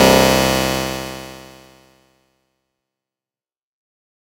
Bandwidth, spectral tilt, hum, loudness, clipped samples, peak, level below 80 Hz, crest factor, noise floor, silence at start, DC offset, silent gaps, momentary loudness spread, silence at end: 16.5 kHz; -3.5 dB/octave; none; -16 LUFS; under 0.1%; 0 dBFS; -38 dBFS; 20 dB; under -90 dBFS; 0 s; under 0.1%; none; 23 LU; 2.95 s